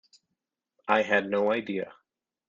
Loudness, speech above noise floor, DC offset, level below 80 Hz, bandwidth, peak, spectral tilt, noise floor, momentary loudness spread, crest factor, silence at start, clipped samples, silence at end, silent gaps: -27 LUFS; 58 dB; under 0.1%; -72 dBFS; 7.4 kHz; -8 dBFS; -5.5 dB/octave; -85 dBFS; 16 LU; 22 dB; 0.85 s; under 0.1%; 0.55 s; none